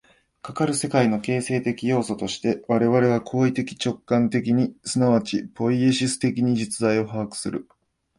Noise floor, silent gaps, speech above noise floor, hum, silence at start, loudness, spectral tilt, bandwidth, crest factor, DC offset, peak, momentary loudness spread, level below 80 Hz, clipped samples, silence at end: -41 dBFS; none; 19 dB; none; 0.45 s; -23 LUFS; -5.5 dB/octave; 11.5 kHz; 18 dB; under 0.1%; -4 dBFS; 8 LU; -58 dBFS; under 0.1%; 0.55 s